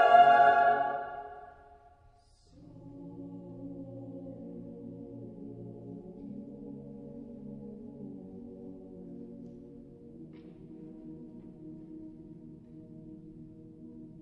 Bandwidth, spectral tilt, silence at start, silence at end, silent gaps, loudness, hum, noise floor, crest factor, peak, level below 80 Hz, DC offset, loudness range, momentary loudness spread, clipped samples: 5.2 kHz; -7 dB/octave; 0 s; 1.05 s; none; -25 LUFS; none; -62 dBFS; 24 dB; -8 dBFS; -64 dBFS; under 0.1%; 14 LU; 22 LU; under 0.1%